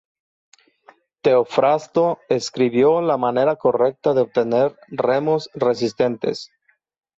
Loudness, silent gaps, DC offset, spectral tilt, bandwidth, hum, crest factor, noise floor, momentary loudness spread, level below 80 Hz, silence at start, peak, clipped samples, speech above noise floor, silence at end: -19 LUFS; none; under 0.1%; -6 dB/octave; 8 kHz; none; 14 dB; -53 dBFS; 6 LU; -64 dBFS; 1.25 s; -6 dBFS; under 0.1%; 35 dB; 0.75 s